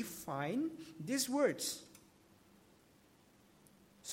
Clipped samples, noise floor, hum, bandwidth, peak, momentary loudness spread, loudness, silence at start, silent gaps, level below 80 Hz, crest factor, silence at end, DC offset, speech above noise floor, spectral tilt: under 0.1%; -67 dBFS; none; 16.5 kHz; -20 dBFS; 15 LU; -38 LUFS; 0 s; none; -80 dBFS; 20 dB; 0 s; under 0.1%; 29 dB; -3.5 dB/octave